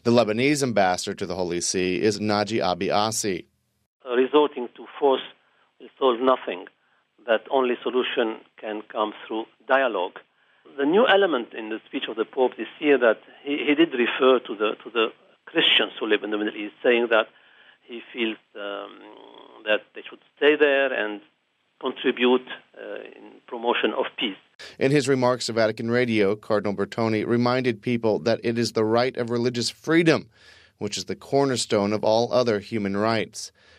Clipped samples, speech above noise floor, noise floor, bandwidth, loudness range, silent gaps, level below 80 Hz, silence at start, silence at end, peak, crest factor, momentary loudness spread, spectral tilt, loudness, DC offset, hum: under 0.1%; 38 dB; -61 dBFS; 14 kHz; 4 LU; 3.86-4.00 s, 24.55-24.59 s; -68 dBFS; 0.05 s; 0.3 s; -4 dBFS; 20 dB; 15 LU; -4.5 dB/octave; -23 LUFS; under 0.1%; none